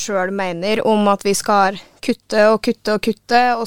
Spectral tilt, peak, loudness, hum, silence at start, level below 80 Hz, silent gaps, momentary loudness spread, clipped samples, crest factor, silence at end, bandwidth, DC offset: -4 dB/octave; -2 dBFS; -17 LUFS; none; 0 s; -52 dBFS; none; 7 LU; under 0.1%; 14 dB; 0 s; 17 kHz; 1%